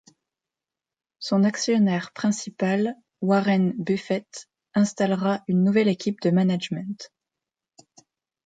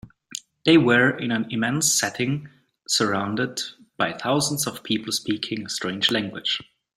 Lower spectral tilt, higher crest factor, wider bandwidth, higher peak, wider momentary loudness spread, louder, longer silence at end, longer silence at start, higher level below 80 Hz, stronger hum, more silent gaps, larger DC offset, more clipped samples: first, -6 dB/octave vs -3 dB/octave; about the same, 16 dB vs 20 dB; second, 9.2 kHz vs 16 kHz; second, -8 dBFS vs -4 dBFS; about the same, 11 LU vs 10 LU; about the same, -23 LUFS vs -22 LUFS; first, 1.4 s vs 0.35 s; first, 1.2 s vs 0.05 s; second, -70 dBFS vs -62 dBFS; neither; neither; neither; neither